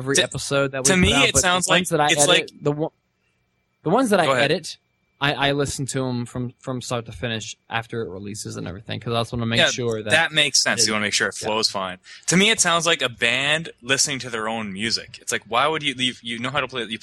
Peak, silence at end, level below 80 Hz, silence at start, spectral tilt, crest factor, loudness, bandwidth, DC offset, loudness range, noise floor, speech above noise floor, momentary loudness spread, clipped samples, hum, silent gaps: -2 dBFS; 0.05 s; -48 dBFS; 0 s; -2.5 dB/octave; 20 dB; -20 LUFS; 16 kHz; under 0.1%; 7 LU; -69 dBFS; 48 dB; 14 LU; under 0.1%; none; none